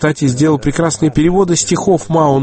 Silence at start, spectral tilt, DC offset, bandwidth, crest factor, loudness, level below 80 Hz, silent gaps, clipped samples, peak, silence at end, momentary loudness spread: 0 s; -5.5 dB/octave; under 0.1%; 8.8 kHz; 12 dB; -13 LUFS; -34 dBFS; none; under 0.1%; 0 dBFS; 0 s; 2 LU